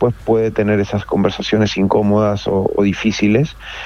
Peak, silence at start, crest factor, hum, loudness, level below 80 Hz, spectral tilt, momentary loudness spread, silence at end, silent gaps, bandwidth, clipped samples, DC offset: -2 dBFS; 0 s; 14 dB; none; -16 LUFS; -40 dBFS; -6.5 dB/octave; 3 LU; 0 s; none; 7 kHz; under 0.1%; under 0.1%